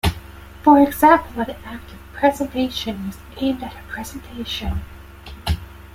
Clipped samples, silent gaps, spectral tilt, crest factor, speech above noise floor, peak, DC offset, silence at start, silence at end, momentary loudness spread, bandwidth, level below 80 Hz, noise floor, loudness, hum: under 0.1%; none; -5.5 dB/octave; 18 dB; 19 dB; -2 dBFS; under 0.1%; 0.05 s; 0.1 s; 23 LU; 16.5 kHz; -36 dBFS; -38 dBFS; -20 LUFS; none